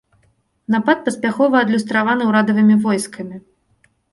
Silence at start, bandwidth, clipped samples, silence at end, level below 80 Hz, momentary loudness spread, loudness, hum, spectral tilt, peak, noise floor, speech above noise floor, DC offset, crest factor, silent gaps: 0.7 s; 11.5 kHz; under 0.1%; 0.75 s; -62 dBFS; 14 LU; -16 LUFS; none; -5.5 dB/octave; -2 dBFS; -61 dBFS; 45 dB; under 0.1%; 16 dB; none